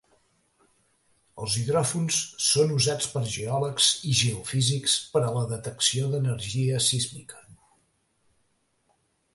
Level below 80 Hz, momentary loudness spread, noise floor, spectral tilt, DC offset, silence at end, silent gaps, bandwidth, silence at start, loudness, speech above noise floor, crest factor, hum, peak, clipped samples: -58 dBFS; 8 LU; -71 dBFS; -3.5 dB/octave; under 0.1%; 1.8 s; none; 12 kHz; 1.35 s; -25 LUFS; 45 dB; 22 dB; none; -6 dBFS; under 0.1%